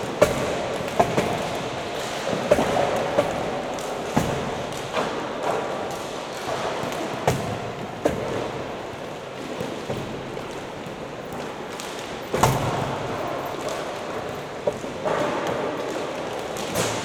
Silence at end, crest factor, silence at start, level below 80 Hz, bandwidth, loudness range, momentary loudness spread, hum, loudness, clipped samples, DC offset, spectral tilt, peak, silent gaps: 0 s; 24 dB; 0 s; -48 dBFS; over 20 kHz; 6 LU; 11 LU; none; -27 LUFS; under 0.1%; under 0.1%; -4.5 dB/octave; -4 dBFS; none